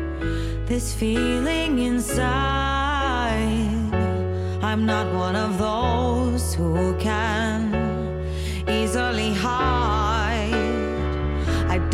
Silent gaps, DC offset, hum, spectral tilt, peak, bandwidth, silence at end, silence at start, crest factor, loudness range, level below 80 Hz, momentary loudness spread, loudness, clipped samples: none; under 0.1%; none; -5.5 dB/octave; -8 dBFS; 15.5 kHz; 0 s; 0 s; 14 dB; 1 LU; -30 dBFS; 4 LU; -23 LUFS; under 0.1%